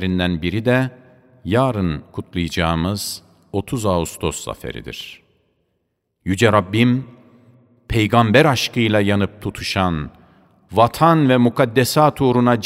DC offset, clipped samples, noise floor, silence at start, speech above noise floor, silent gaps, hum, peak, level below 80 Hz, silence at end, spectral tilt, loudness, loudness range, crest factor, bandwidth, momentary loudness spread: under 0.1%; under 0.1%; -71 dBFS; 0 s; 54 dB; none; none; 0 dBFS; -42 dBFS; 0 s; -5.5 dB/octave; -18 LUFS; 6 LU; 18 dB; 16 kHz; 15 LU